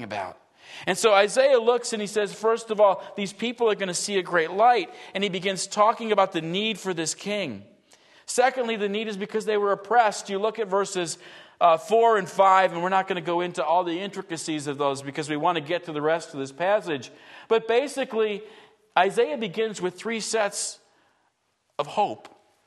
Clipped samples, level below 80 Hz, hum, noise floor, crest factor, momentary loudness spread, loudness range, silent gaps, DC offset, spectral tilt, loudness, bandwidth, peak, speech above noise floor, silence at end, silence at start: under 0.1%; -78 dBFS; none; -72 dBFS; 20 dB; 12 LU; 5 LU; none; under 0.1%; -3.5 dB/octave; -24 LUFS; 12.5 kHz; -4 dBFS; 48 dB; 0.4 s; 0 s